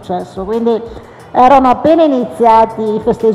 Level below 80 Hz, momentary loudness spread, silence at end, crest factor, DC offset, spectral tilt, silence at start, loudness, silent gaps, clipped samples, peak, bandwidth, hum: -40 dBFS; 12 LU; 0 s; 10 dB; under 0.1%; -7 dB/octave; 0 s; -11 LUFS; none; 0.4%; 0 dBFS; 12.5 kHz; none